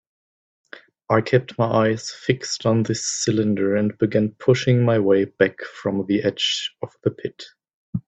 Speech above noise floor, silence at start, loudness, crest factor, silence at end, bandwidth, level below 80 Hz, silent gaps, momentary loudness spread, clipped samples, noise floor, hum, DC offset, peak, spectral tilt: over 70 dB; 1.1 s; -21 LUFS; 20 dB; 0.1 s; 9 kHz; -58 dBFS; 7.74-7.93 s; 9 LU; under 0.1%; under -90 dBFS; none; under 0.1%; -2 dBFS; -5 dB/octave